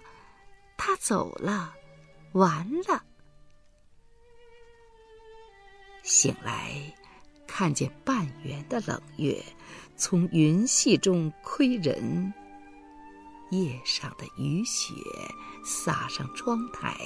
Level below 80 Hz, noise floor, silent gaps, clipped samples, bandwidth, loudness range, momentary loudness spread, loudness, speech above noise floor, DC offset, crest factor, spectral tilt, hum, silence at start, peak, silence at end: -60 dBFS; -56 dBFS; none; under 0.1%; 11 kHz; 7 LU; 17 LU; -28 LUFS; 28 dB; under 0.1%; 22 dB; -4 dB/octave; none; 0.05 s; -8 dBFS; 0 s